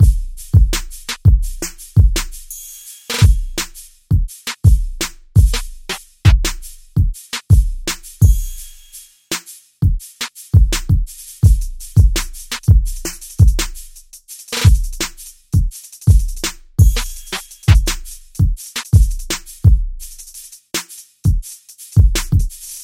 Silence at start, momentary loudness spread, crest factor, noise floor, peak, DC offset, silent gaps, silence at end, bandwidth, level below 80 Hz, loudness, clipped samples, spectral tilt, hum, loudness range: 0 s; 18 LU; 16 dB; -41 dBFS; 0 dBFS; under 0.1%; none; 0 s; 16.5 kHz; -18 dBFS; -17 LUFS; under 0.1%; -4.5 dB/octave; none; 2 LU